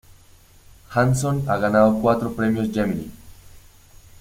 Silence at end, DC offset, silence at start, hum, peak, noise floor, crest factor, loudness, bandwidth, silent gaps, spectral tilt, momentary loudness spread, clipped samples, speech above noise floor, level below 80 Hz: 0.65 s; under 0.1%; 0.9 s; none; -4 dBFS; -50 dBFS; 18 dB; -21 LUFS; 16.5 kHz; none; -7 dB/octave; 9 LU; under 0.1%; 31 dB; -46 dBFS